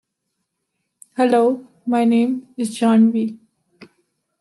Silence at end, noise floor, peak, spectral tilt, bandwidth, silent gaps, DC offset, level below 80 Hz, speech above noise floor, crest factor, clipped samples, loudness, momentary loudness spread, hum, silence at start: 1.05 s; -76 dBFS; -4 dBFS; -6 dB/octave; 12 kHz; none; under 0.1%; -74 dBFS; 59 dB; 14 dB; under 0.1%; -18 LUFS; 12 LU; none; 1.2 s